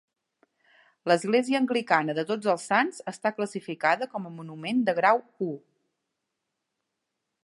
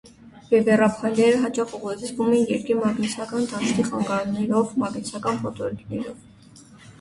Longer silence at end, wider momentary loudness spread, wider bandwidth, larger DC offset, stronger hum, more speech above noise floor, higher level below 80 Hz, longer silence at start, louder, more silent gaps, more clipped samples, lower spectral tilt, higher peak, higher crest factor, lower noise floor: first, 1.85 s vs 0.1 s; about the same, 12 LU vs 11 LU; about the same, 11.5 kHz vs 11.5 kHz; neither; neither; first, 57 dB vs 26 dB; second, -82 dBFS vs -58 dBFS; first, 1.05 s vs 0.05 s; second, -26 LUFS vs -23 LUFS; neither; neither; about the same, -5 dB/octave vs -5.5 dB/octave; about the same, -6 dBFS vs -6 dBFS; about the same, 22 dB vs 18 dB; first, -83 dBFS vs -48 dBFS